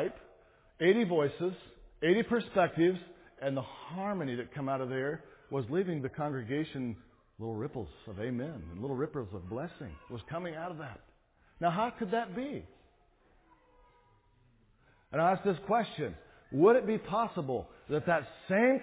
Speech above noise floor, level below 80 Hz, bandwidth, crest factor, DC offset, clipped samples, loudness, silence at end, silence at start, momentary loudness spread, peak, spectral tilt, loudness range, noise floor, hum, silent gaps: 34 dB; -62 dBFS; 4 kHz; 20 dB; under 0.1%; under 0.1%; -33 LUFS; 0 s; 0 s; 14 LU; -14 dBFS; -5.5 dB/octave; 9 LU; -67 dBFS; none; none